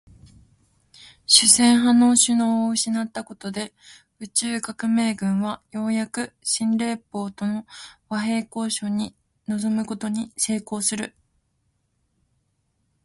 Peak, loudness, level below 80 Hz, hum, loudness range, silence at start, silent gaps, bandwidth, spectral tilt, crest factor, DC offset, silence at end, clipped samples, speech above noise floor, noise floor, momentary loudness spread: 0 dBFS; -21 LUFS; -62 dBFS; none; 9 LU; 1 s; none; 11.5 kHz; -2.5 dB/octave; 24 dB; under 0.1%; 1.95 s; under 0.1%; 48 dB; -71 dBFS; 17 LU